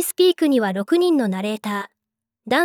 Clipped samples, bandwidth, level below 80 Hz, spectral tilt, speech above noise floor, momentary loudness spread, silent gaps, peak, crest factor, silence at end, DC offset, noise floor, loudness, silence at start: under 0.1%; 18 kHz; -74 dBFS; -4.5 dB/octave; 63 dB; 10 LU; none; -6 dBFS; 12 dB; 0 s; under 0.1%; -82 dBFS; -20 LUFS; 0 s